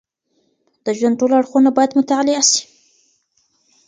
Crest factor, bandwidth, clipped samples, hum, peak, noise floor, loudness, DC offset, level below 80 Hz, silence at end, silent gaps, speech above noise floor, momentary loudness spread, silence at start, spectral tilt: 18 dB; 9.6 kHz; under 0.1%; none; 0 dBFS; -65 dBFS; -15 LUFS; under 0.1%; -68 dBFS; 1.25 s; none; 51 dB; 6 LU; 0.85 s; -2 dB/octave